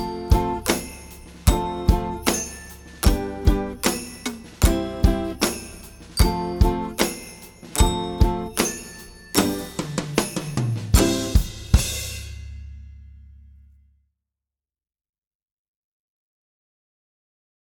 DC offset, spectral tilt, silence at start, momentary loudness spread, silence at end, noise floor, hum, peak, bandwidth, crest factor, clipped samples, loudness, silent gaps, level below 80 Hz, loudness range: under 0.1%; -4.5 dB/octave; 0 s; 17 LU; 4.55 s; under -90 dBFS; none; -2 dBFS; 19 kHz; 22 dB; under 0.1%; -23 LUFS; none; -28 dBFS; 3 LU